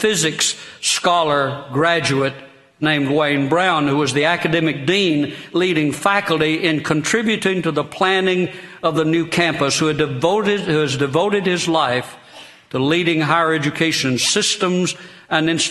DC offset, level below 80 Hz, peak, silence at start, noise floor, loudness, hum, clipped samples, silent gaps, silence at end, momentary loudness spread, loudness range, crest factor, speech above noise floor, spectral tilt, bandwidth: under 0.1%; -56 dBFS; 0 dBFS; 0 s; -42 dBFS; -17 LUFS; none; under 0.1%; none; 0 s; 5 LU; 1 LU; 18 dB; 24 dB; -4 dB/octave; 12.5 kHz